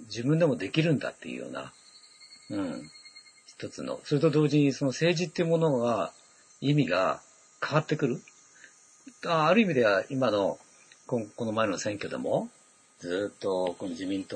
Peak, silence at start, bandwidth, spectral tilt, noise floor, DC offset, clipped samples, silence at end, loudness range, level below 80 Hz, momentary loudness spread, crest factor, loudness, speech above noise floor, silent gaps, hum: -10 dBFS; 0 s; 9.4 kHz; -6 dB/octave; -56 dBFS; under 0.1%; under 0.1%; 0 s; 5 LU; -72 dBFS; 16 LU; 20 dB; -28 LUFS; 28 dB; none; none